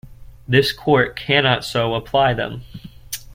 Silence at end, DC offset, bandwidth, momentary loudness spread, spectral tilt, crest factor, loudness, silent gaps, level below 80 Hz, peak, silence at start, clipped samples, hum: 0 s; under 0.1%; 16.5 kHz; 15 LU; -5 dB/octave; 18 dB; -18 LUFS; none; -44 dBFS; -2 dBFS; 0.05 s; under 0.1%; none